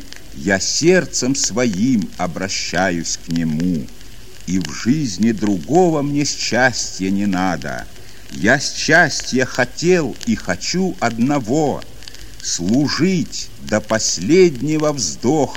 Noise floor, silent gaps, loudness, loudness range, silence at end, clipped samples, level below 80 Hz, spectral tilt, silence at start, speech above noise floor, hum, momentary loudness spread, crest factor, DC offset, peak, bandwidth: -39 dBFS; none; -17 LUFS; 3 LU; 0 s; under 0.1%; -42 dBFS; -4 dB/octave; 0 s; 22 dB; none; 11 LU; 18 dB; 3%; 0 dBFS; 16.5 kHz